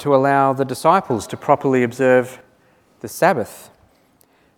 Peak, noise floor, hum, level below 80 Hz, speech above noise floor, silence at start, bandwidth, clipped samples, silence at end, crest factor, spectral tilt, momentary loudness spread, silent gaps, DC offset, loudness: 0 dBFS; -57 dBFS; none; -62 dBFS; 40 dB; 0 s; 18 kHz; under 0.1%; 0.95 s; 18 dB; -6 dB/octave; 16 LU; none; under 0.1%; -17 LUFS